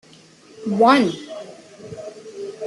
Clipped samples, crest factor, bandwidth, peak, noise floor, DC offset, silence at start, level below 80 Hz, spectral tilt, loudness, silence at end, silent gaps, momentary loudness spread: under 0.1%; 20 dB; 12 kHz; -4 dBFS; -48 dBFS; under 0.1%; 0.6 s; -68 dBFS; -5.5 dB/octave; -17 LUFS; 0 s; none; 24 LU